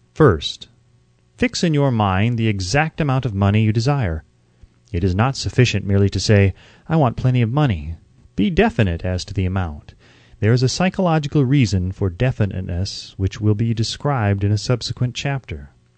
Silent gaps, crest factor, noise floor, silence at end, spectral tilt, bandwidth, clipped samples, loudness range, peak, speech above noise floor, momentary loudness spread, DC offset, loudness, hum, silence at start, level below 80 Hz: none; 18 dB; -56 dBFS; 0.3 s; -6.5 dB/octave; 9 kHz; under 0.1%; 3 LU; 0 dBFS; 38 dB; 10 LU; under 0.1%; -19 LUFS; none; 0.15 s; -38 dBFS